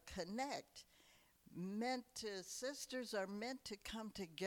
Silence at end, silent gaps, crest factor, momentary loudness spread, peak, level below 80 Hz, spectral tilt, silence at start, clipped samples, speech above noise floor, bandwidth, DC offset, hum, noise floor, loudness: 0 s; none; 16 dB; 9 LU; -32 dBFS; -72 dBFS; -3.5 dB/octave; 0.05 s; under 0.1%; 24 dB; 19 kHz; under 0.1%; none; -71 dBFS; -47 LUFS